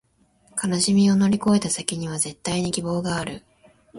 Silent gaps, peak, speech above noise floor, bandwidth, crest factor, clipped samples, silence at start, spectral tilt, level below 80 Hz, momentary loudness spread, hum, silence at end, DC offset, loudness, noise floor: none; -2 dBFS; 39 dB; 11.5 kHz; 22 dB; under 0.1%; 0.55 s; -4.5 dB/octave; -54 dBFS; 11 LU; none; 0 s; under 0.1%; -22 LUFS; -60 dBFS